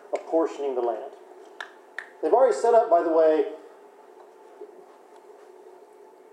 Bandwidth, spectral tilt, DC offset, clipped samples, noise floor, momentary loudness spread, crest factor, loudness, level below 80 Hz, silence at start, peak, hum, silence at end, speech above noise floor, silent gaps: 10 kHz; -3.5 dB/octave; under 0.1%; under 0.1%; -50 dBFS; 23 LU; 18 dB; -23 LUFS; under -90 dBFS; 0.1 s; -8 dBFS; none; 0.65 s; 29 dB; none